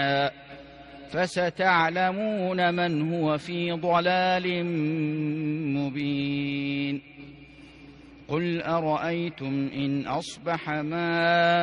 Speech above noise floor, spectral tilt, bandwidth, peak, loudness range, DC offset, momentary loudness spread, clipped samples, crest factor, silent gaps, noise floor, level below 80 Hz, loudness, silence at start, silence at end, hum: 23 dB; -6.5 dB/octave; 10.5 kHz; -8 dBFS; 6 LU; under 0.1%; 10 LU; under 0.1%; 18 dB; none; -48 dBFS; -62 dBFS; -26 LUFS; 0 s; 0 s; none